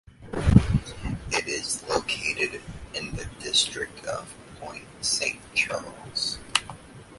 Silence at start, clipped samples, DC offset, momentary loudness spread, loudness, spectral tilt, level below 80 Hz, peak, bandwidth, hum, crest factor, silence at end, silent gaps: 0.2 s; under 0.1%; under 0.1%; 18 LU; -26 LUFS; -3.5 dB/octave; -38 dBFS; 0 dBFS; 11.5 kHz; none; 28 dB; 0 s; none